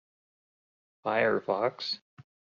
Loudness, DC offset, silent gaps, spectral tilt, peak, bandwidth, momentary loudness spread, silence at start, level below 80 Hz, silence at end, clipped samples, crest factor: -30 LUFS; under 0.1%; 2.01-2.17 s; -2 dB/octave; -12 dBFS; 7.2 kHz; 10 LU; 1.05 s; -76 dBFS; 0.4 s; under 0.1%; 20 dB